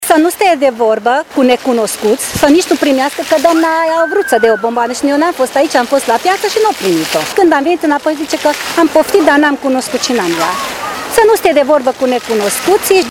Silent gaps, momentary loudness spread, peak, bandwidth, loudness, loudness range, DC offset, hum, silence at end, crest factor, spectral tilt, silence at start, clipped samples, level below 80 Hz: none; 5 LU; 0 dBFS; 19.5 kHz; -11 LUFS; 1 LU; under 0.1%; none; 0 s; 10 dB; -3 dB/octave; 0 s; 0.2%; -46 dBFS